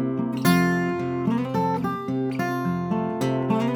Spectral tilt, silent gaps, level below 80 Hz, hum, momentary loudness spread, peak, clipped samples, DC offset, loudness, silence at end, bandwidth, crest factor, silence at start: -6.5 dB/octave; none; -58 dBFS; none; 6 LU; -6 dBFS; under 0.1%; under 0.1%; -24 LUFS; 0 s; over 20 kHz; 16 dB; 0 s